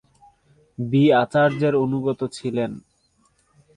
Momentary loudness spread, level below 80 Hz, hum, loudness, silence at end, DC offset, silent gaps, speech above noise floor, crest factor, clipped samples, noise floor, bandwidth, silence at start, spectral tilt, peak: 15 LU; -60 dBFS; none; -21 LUFS; 1 s; under 0.1%; none; 44 dB; 16 dB; under 0.1%; -64 dBFS; 10.5 kHz; 0.8 s; -7.5 dB/octave; -6 dBFS